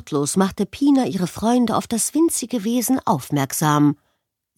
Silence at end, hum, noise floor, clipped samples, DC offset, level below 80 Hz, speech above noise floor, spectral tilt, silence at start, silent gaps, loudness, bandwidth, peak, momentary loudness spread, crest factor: 0.65 s; none; -72 dBFS; under 0.1%; under 0.1%; -54 dBFS; 53 dB; -5 dB/octave; 0.05 s; none; -20 LUFS; 17 kHz; -2 dBFS; 5 LU; 16 dB